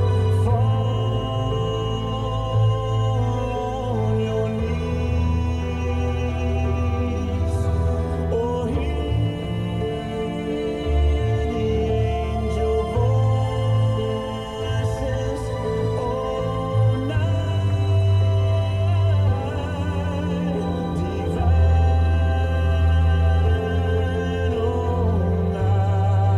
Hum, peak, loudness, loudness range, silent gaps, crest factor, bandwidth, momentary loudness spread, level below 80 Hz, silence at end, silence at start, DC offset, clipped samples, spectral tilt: none; -8 dBFS; -22 LUFS; 4 LU; none; 12 dB; 10 kHz; 6 LU; -28 dBFS; 0 s; 0 s; under 0.1%; under 0.1%; -8 dB/octave